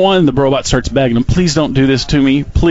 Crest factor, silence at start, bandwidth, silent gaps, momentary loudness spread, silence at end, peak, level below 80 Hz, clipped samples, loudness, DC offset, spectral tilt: 10 dB; 0 s; 8 kHz; none; 2 LU; 0 s; -2 dBFS; -24 dBFS; under 0.1%; -12 LUFS; under 0.1%; -5.5 dB/octave